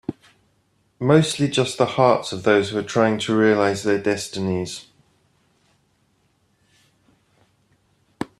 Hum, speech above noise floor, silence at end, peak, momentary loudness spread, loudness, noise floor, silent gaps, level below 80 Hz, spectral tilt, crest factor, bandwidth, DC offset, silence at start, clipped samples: none; 45 dB; 0.15 s; -2 dBFS; 10 LU; -20 LUFS; -65 dBFS; none; -60 dBFS; -5.5 dB/octave; 20 dB; 13 kHz; under 0.1%; 0.1 s; under 0.1%